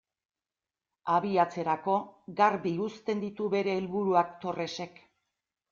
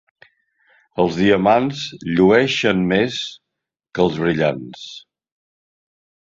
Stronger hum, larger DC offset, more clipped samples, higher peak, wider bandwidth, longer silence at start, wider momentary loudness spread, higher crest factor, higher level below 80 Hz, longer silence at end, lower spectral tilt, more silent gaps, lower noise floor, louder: neither; neither; neither; second, -10 dBFS vs -2 dBFS; about the same, 7.4 kHz vs 7.8 kHz; about the same, 1.05 s vs 0.95 s; second, 10 LU vs 18 LU; about the same, 20 dB vs 18 dB; second, -72 dBFS vs -52 dBFS; second, 0.85 s vs 1.3 s; about the same, -6.5 dB/octave vs -6 dB/octave; neither; first, under -90 dBFS vs -82 dBFS; second, -30 LUFS vs -17 LUFS